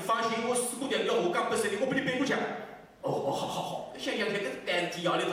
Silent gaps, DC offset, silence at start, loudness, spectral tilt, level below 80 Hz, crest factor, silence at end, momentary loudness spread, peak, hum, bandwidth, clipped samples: none; under 0.1%; 0 s; -31 LUFS; -3.5 dB/octave; -70 dBFS; 14 dB; 0 s; 8 LU; -18 dBFS; none; 16 kHz; under 0.1%